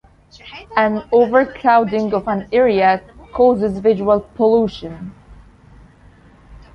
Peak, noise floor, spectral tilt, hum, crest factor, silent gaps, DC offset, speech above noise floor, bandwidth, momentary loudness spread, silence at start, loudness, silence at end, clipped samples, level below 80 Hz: 0 dBFS; -46 dBFS; -7.5 dB/octave; none; 18 dB; none; under 0.1%; 31 dB; 6.4 kHz; 17 LU; 0.45 s; -16 LUFS; 0.2 s; under 0.1%; -46 dBFS